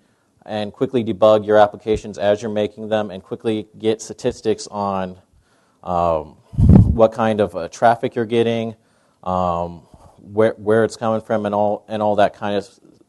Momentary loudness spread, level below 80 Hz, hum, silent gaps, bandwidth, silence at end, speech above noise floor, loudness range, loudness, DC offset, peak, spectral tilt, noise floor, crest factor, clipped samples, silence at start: 12 LU; -34 dBFS; none; none; 11.5 kHz; 0.45 s; 39 dB; 6 LU; -19 LUFS; under 0.1%; 0 dBFS; -7 dB/octave; -57 dBFS; 18 dB; under 0.1%; 0.5 s